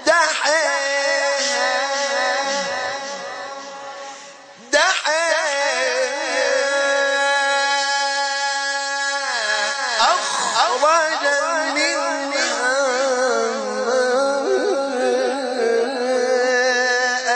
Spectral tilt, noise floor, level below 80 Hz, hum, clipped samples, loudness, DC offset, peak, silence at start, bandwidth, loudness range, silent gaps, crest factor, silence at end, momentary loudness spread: 0 dB/octave; -41 dBFS; -70 dBFS; none; under 0.1%; -18 LUFS; under 0.1%; -4 dBFS; 0 s; 10 kHz; 3 LU; none; 16 dB; 0 s; 6 LU